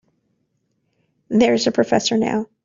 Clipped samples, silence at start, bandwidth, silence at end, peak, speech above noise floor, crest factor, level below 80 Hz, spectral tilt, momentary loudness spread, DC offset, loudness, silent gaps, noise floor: under 0.1%; 1.3 s; 7.6 kHz; 0.2 s; -2 dBFS; 52 dB; 18 dB; -58 dBFS; -4.5 dB/octave; 6 LU; under 0.1%; -18 LUFS; none; -69 dBFS